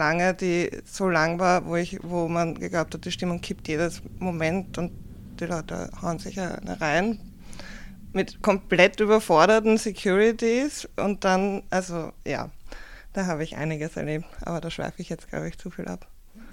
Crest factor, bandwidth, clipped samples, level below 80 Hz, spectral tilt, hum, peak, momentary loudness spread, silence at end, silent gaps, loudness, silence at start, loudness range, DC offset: 22 dB; 16.5 kHz; under 0.1%; -46 dBFS; -5 dB/octave; none; -2 dBFS; 17 LU; 0 s; none; -25 LUFS; 0 s; 10 LU; under 0.1%